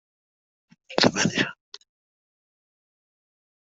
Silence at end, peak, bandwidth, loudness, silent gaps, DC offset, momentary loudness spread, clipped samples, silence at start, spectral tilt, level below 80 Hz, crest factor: 2.1 s; -2 dBFS; 8.2 kHz; -23 LUFS; none; under 0.1%; 12 LU; under 0.1%; 0.9 s; -3.5 dB/octave; -64 dBFS; 28 dB